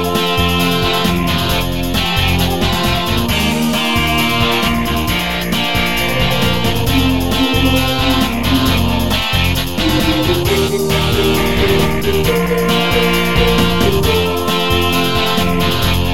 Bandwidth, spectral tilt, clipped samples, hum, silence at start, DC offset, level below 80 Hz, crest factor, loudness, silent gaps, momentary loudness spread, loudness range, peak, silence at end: 17 kHz; -4.5 dB/octave; under 0.1%; none; 0 s; 4%; -26 dBFS; 14 dB; -14 LUFS; none; 2 LU; 1 LU; 0 dBFS; 0 s